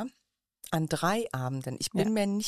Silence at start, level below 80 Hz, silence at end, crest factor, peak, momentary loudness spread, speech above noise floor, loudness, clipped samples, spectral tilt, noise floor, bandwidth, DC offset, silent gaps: 0 s; -64 dBFS; 0 s; 16 dB; -14 dBFS; 8 LU; 47 dB; -30 LUFS; under 0.1%; -5 dB/octave; -77 dBFS; 15 kHz; under 0.1%; none